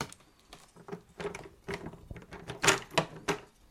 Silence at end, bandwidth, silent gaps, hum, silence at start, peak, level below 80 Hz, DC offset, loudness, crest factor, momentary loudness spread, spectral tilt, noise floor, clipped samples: 0.25 s; 16.5 kHz; none; none; 0 s; -8 dBFS; -58 dBFS; under 0.1%; -33 LUFS; 28 dB; 21 LU; -2.5 dB/octave; -57 dBFS; under 0.1%